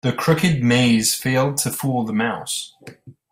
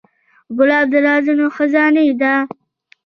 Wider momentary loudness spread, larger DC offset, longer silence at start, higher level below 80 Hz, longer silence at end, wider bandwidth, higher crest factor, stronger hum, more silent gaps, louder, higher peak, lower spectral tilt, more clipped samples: first, 10 LU vs 6 LU; neither; second, 0.05 s vs 0.5 s; first, -52 dBFS vs -64 dBFS; second, 0.2 s vs 0.6 s; first, 16 kHz vs 6.2 kHz; about the same, 16 dB vs 14 dB; neither; neither; second, -19 LUFS vs -14 LUFS; about the same, -4 dBFS vs -2 dBFS; second, -4.5 dB/octave vs -6 dB/octave; neither